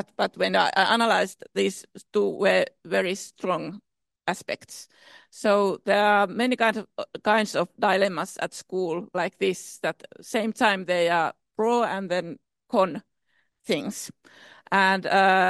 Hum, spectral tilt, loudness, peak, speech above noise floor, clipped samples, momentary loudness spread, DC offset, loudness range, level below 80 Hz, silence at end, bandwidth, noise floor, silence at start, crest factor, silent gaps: none; -4 dB/octave; -25 LUFS; -6 dBFS; 47 dB; under 0.1%; 13 LU; under 0.1%; 4 LU; -74 dBFS; 0 s; 12.5 kHz; -71 dBFS; 0.2 s; 20 dB; none